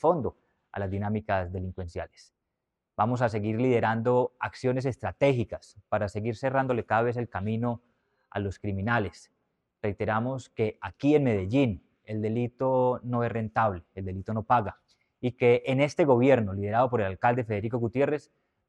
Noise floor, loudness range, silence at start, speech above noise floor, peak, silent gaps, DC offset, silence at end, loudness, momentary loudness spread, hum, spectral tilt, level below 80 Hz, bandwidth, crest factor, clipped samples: -84 dBFS; 6 LU; 0.05 s; 57 dB; -8 dBFS; none; under 0.1%; 0.5 s; -28 LUFS; 13 LU; none; -8 dB/octave; -58 dBFS; 9.4 kHz; 20 dB; under 0.1%